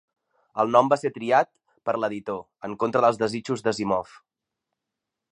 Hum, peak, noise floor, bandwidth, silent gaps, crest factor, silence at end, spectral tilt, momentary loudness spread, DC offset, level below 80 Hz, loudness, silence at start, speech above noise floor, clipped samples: none; -2 dBFS; -85 dBFS; 10.5 kHz; none; 22 dB; 1.3 s; -5.5 dB/octave; 14 LU; under 0.1%; -66 dBFS; -24 LUFS; 0.55 s; 62 dB; under 0.1%